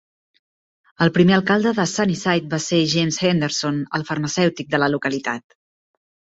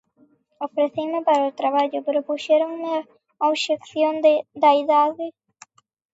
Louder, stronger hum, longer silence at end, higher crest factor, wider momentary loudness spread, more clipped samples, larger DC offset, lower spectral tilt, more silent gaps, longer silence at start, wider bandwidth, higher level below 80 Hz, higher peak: about the same, -19 LUFS vs -21 LUFS; neither; first, 1 s vs 0.85 s; about the same, 18 dB vs 16 dB; about the same, 8 LU vs 10 LU; neither; neither; first, -5 dB/octave vs -3.5 dB/octave; neither; first, 1 s vs 0.6 s; about the same, 8 kHz vs 8 kHz; first, -58 dBFS vs -78 dBFS; about the same, -2 dBFS vs -4 dBFS